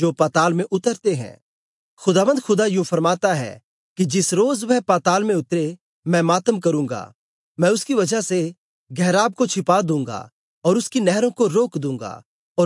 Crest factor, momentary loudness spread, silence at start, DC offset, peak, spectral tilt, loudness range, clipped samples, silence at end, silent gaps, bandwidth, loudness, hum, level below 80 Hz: 16 dB; 11 LU; 0 s; under 0.1%; -4 dBFS; -5 dB/octave; 2 LU; under 0.1%; 0 s; 1.42-1.97 s, 3.64-3.96 s, 5.81-6.03 s, 7.15-7.55 s, 8.58-8.86 s, 10.32-10.62 s, 12.26-12.55 s; 11.5 kHz; -20 LUFS; none; -72 dBFS